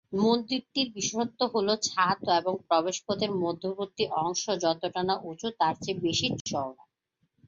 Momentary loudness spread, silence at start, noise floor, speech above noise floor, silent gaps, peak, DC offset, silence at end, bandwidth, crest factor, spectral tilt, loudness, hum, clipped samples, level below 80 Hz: 6 LU; 0.1 s; -77 dBFS; 48 dB; 6.41-6.45 s; -10 dBFS; under 0.1%; 0.75 s; 7.8 kHz; 18 dB; -3.5 dB/octave; -28 LUFS; none; under 0.1%; -64 dBFS